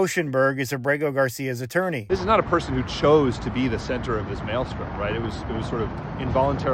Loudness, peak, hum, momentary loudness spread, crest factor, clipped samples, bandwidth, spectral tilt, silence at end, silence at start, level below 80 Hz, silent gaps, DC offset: -24 LUFS; -6 dBFS; none; 9 LU; 16 dB; under 0.1%; 16 kHz; -6 dB/octave; 0 s; 0 s; -40 dBFS; none; under 0.1%